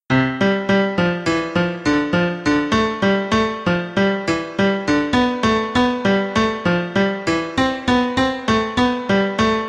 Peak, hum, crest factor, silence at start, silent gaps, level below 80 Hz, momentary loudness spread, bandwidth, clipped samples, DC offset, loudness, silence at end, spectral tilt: -4 dBFS; none; 14 dB; 0.1 s; none; -42 dBFS; 3 LU; 10 kHz; under 0.1%; under 0.1%; -18 LUFS; 0 s; -5.5 dB/octave